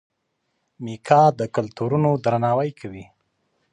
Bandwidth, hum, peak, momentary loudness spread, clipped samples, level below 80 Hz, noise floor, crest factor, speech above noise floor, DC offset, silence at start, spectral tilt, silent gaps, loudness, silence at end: 10.5 kHz; none; 0 dBFS; 21 LU; under 0.1%; -60 dBFS; -74 dBFS; 22 dB; 54 dB; under 0.1%; 0.8 s; -8 dB/octave; none; -20 LUFS; 0.7 s